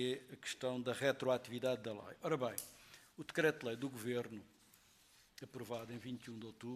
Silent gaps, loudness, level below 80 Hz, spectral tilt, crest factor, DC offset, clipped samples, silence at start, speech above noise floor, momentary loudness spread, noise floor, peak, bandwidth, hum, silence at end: none; -42 LUFS; -80 dBFS; -4.5 dB/octave; 22 dB; under 0.1%; under 0.1%; 0 s; 27 dB; 17 LU; -69 dBFS; -20 dBFS; 14.5 kHz; none; 0 s